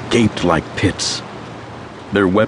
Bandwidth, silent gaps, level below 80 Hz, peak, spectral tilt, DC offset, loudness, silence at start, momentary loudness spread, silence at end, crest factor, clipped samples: 10.5 kHz; none; -42 dBFS; 0 dBFS; -5 dB/octave; under 0.1%; -17 LUFS; 0 s; 17 LU; 0 s; 18 dB; under 0.1%